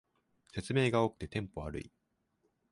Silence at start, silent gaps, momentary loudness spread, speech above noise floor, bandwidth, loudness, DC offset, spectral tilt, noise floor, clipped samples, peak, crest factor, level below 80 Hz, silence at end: 0.55 s; none; 15 LU; 45 dB; 11.5 kHz; -34 LUFS; under 0.1%; -6.5 dB/octave; -79 dBFS; under 0.1%; -16 dBFS; 20 dB; -56 dBFS; 0.85 s